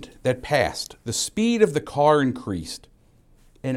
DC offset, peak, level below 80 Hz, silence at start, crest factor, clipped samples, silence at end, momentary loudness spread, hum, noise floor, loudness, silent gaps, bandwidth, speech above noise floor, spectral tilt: under 0.1%; -4 dBFS; -50 dBFS; 0 s; 20 dB; under 0.1%; 0 s; 13 LU; none; -56 dBFS; -23 LUFS; none; 16 kHz; 33 dB; -4.5 dB/octave